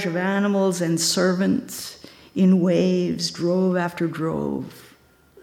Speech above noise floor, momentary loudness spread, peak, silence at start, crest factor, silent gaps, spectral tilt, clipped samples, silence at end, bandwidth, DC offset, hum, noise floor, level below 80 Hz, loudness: 33 dB; 14 LU; -8 dBFS; 0 s; 14 dB; none; -5 dB/octave; under 0.1%; 0.6 s; 16 kHz; under 0.1%; none; -54 dBFS; -60 dBFS; -21 LUFS